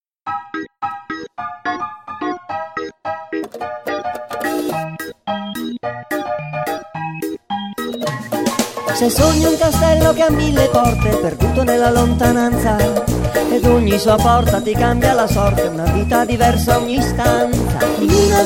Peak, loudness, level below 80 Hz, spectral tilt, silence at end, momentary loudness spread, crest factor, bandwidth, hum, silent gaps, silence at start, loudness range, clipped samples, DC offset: 0 dBFS; -17 LUFS; -28 dBFS; -5.5 dB/octave; 0 s; 13 LU; 16 dB; 16.5 kHz; none; none; 0.25 s; 10 LU; under 0.1%; under 0.1%